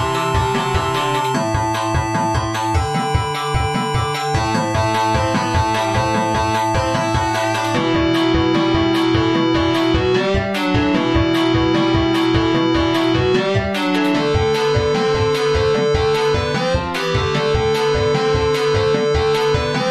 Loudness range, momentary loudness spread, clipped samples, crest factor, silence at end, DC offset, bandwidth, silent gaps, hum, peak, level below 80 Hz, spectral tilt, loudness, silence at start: 2 LU; 3 LU; under 0.1%; 14 dB; 0 s; under 0.1%; 13.5 kHz; none; none; -4 dBFS; -32 dBFS; -5.5 dB/octave; -17 LUFS; 0 s